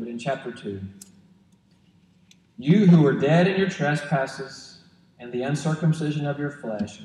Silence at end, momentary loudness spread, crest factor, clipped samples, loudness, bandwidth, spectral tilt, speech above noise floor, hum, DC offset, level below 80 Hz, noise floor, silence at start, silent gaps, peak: 0 s; 20 LU; 18 dB; under 0.1%; -23 LUFS; 10.5 kHz; -7.5 dB/octave; 37 dB; none; under 0.1%; -66 dBFS; -59 dBFS; 0 s; none; -6 dBFS